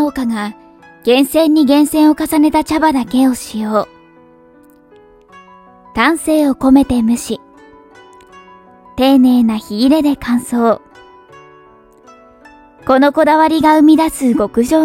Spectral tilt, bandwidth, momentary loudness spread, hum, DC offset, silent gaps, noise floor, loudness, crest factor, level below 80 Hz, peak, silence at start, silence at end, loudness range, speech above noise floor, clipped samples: -4.5 dB/octave; 16 kHz; 11 LU; none; under 0.1%; none; -45 dBFS; -12 LUFS; 14 dB; -42 dBFS; 0 dBFS; 0 s; 0 s; 6 LU; 33 dB; under 0.1%